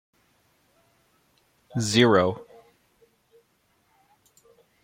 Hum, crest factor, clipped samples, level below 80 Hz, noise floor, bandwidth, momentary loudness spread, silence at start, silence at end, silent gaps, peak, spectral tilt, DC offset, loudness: none; 24 dB; under 0.1%; -66 dBFS; -68 dBFS; 16 kHz; 17 LU; 1.75 s; 2.4 s; none; -4 dBFS; -4.5 dB/octave; under 0.1%; -22 LUFS